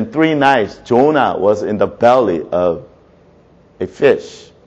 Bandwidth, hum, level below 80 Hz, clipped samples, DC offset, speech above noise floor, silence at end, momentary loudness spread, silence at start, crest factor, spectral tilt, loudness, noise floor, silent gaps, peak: 8.4 kHz; none; -50 dBFS; under 0.1%; under 0.1%; 34 dB; 0.3 s; 11 LU; 0 s; 14 dB; -6.5 dB/octave; -14 LUFS; -47 dBFS; none; 0 dBFS